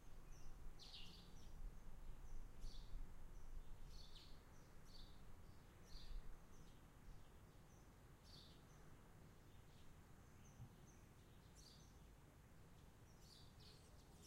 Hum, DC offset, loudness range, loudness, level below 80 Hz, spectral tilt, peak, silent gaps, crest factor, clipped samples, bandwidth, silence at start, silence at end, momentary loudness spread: none; under 0.1%; 5 LU; -65 LUFS; -60 dBFS; -4.5 dB/octave; -40 dBFS; none; 16 dB; under 0.1%; 16 kHz; 0 s; 0 s; 7 LU